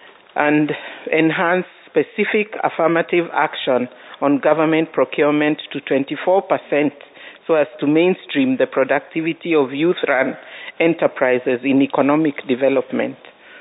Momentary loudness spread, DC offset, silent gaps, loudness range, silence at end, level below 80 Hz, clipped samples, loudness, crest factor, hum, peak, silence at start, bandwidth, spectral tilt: 7 LU; under 0.1%; none; 1 LU; 0 s; -74 dBFS; under 0.1%; -18 LUFS; 18 dB; none; 0 dBFS; 0.35 s; 4 kHz; -11 dB/octave